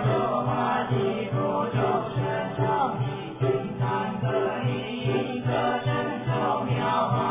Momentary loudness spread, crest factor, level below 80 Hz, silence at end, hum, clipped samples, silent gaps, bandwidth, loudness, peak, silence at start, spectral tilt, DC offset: 3 LU; 14 dB; -54 dBFS; 0 s; none; under 0.1%; none; 3.8 kHz; -26 LUFS; -12 dBFS; 0 s; -11 dB/octave; under 0.1%